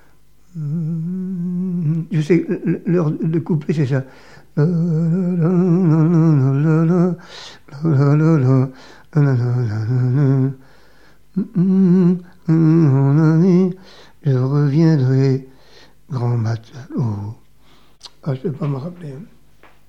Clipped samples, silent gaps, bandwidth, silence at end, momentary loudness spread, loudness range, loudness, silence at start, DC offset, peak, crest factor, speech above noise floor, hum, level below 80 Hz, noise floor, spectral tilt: under 0.1%; none; 7 kHz; 0.65 s; 15 LU; 8 LU; -17 LUFS; 0.55 s; 0.5%; -2 dBFS; 16 dB; 39 dB; none; -58 dBFS; -55 dBFS; -10 dB/octave